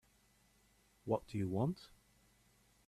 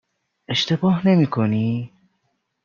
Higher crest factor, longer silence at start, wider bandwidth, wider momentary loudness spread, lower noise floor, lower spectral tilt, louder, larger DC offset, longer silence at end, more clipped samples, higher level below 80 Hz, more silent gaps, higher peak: first, 22 dB vs 16 dB; first, 1.05 s vs 0.5 s; first, 14 kHz vs 7.2 kHz; first, 13 LU vs 9 LU; about the same, -72 dBFS vs -71 dBFS; first, -8.5 dB/octave vs -6.5 dB/octave; second, -40 LUFS vs -20 LUFS; neither; first, 1 s vs 0.75 s; neither; second, -70 dBFS vs -60 dBFS; neither; second, -22 dBFS vs -4 dBFS